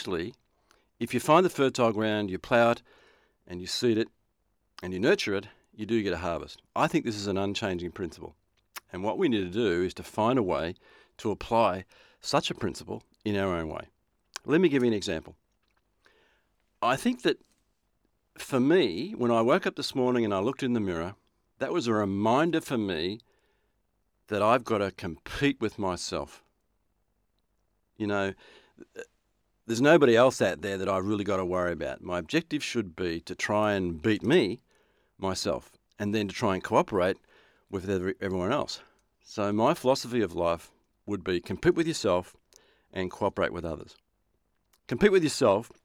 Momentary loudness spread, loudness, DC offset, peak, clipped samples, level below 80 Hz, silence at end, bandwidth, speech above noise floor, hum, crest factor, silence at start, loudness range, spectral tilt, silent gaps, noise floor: 14 LU; -28 LUFS; under 0.1%; -8 dBFS; under 0.1%; -58 dBFS; 0.15 s; 16 kHz; 48 dB; none; 22 dB; 0 s; 5 LU; -5.5 dB/octave; none; -75 dBFS